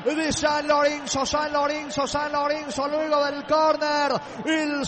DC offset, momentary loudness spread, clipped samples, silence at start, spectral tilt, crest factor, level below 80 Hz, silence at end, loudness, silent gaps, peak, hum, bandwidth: under 0.1%; 5 LU; under 0.1%; 0 s; -3 dB/octave; 12 dB; -52 dBFS; 0 s; -23 LUFS; none; -10 dBFS; none; 8.8 kHz